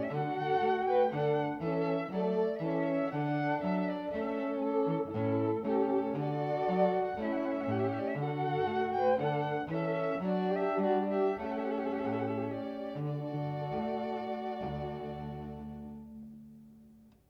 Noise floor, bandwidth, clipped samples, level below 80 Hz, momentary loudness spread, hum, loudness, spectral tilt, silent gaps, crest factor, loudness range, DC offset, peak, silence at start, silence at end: -59 dBFS; 6.4 kHz; under 0.1%; -62 dBFS; 9 LU; none; -33 LUFS; -9 dB/octave; none; 16 dB; 6 LU; under 0.1%; -18 dBFS; 0 s; 0.35 s